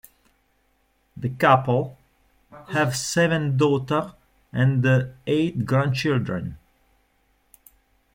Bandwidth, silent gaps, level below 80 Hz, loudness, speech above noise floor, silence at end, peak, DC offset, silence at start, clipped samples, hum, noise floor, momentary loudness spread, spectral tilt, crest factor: 16.5 kHz; none; -56 dBFS; -22 LUFS; 45 dB; 1.6 s; -4 dBFS; under 0.1%; 1.15 s; under 0.1%; none; -66 dBFS; 13 LU; -6 dB/octave; 20 dB